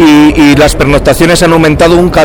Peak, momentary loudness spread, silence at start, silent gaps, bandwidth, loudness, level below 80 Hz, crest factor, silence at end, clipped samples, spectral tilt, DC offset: 0 dBFS; 3 LU; 0 s; none; 19 kHz; -5 LUFS; -18 dBFS; 4 dB; 0 s; 4%; -5.5 dB/octave; under 0.1%